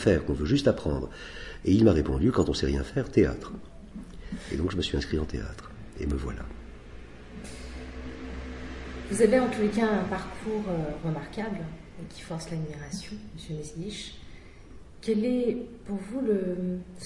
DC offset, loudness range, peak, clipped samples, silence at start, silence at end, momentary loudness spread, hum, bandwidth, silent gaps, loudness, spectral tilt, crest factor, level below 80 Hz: under 0.1%; 12 LU; -8 dBFS; under 0.1%; 0 s; 0 s; 19 LU; none; 11.5 kHz; none; -29 LUFS; -6.5 dB/octave; 20 dB; -42 dBFS